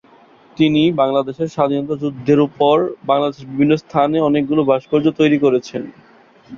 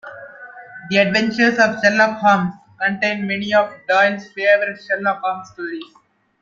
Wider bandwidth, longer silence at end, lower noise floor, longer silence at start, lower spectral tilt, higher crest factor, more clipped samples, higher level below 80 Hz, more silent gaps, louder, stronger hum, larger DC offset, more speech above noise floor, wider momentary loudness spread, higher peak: about the same, 7.2 kHz vs 7.4 kHz; second, 0 s vs 0.6 s; first, -48 dBFS vs -38 dBFS; first, 0.6 s vs 0.05 s; first, -7.5 dB/octave vs -5 dB/octave; about the same, 14 dB vs 18 dB; neither; first, -56 dBFS vs -62 dBFS; neither; about the same, -16 LUFS vs -17 LUFS; neither; neither; first, 32 dB vs 21 dB; second, 7 LU vs 19 LU; about the same, -2 dBFS vs -2 dBFS